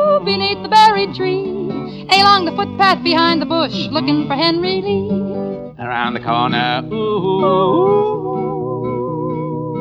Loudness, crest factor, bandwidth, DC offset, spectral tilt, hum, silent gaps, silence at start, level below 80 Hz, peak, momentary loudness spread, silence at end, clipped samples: -16 LUFS; 14 dB; 12 kHz; under 0.1%; -5.5 dB/octave; none; none; 0 s; -50 dBFS; 0 dBFS; 11 LU; 0 s; under 0.1%